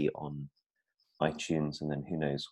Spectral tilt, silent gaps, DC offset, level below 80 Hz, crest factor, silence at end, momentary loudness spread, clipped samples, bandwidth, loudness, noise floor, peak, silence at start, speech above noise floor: -6 dB/octave; 0.66-0.70 s; under 0.1%; -62 dBFS; 22 dB; 0 s; 10 LU; under 0.1%; 11 kHz; -35 LUFS; -79 dBFS; -14 dBFS; 0 s; 45 dB